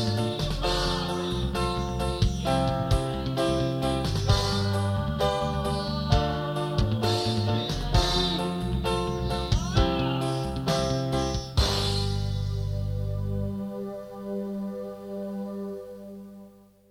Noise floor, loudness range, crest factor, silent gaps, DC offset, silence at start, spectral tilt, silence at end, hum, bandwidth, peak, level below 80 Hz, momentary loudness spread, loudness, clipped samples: -51 dBFS; 7 LU; 18 dB; none; under 0.1%; 0 s; -5.5 dB/octave; 0.4 s; 50 Hz at -40 dBFS; 16 kHz; -8 dBFS; -34 dBFS; 10 LU; -27 LUFS; under 0.1%